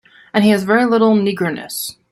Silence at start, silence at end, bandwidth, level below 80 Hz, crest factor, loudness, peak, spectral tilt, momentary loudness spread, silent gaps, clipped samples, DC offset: 0.35 s; 0.2 s; 15.5 kHz; -58 dBFS; 14 dB; -16 LUFS; -2 dBFS; -5 dB/octave; 11 LU; none; under 0.1%; under 0.1%